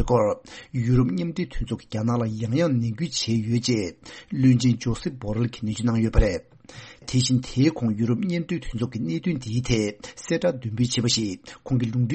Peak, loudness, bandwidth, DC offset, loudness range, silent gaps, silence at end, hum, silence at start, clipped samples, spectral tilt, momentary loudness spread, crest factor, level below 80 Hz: -4 dBFS; -25 LUFS; 8.6 kHz; under 0.1%; 2 LU; none; 0 s; none; 0 s; under 0.1%; -6 dB/octave; 10 LU; 20 dB; -36 dBFS